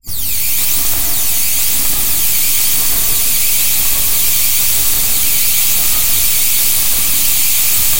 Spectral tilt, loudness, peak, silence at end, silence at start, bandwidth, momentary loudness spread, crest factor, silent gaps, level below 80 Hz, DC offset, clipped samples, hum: 0.5 dB/octave; -10 LUFS; 0 dBFS; 0 s; 0 s; 17.5 kHz; 2 LU; 14 dB; none; -32 dBFS; 20%; under 0.1%; none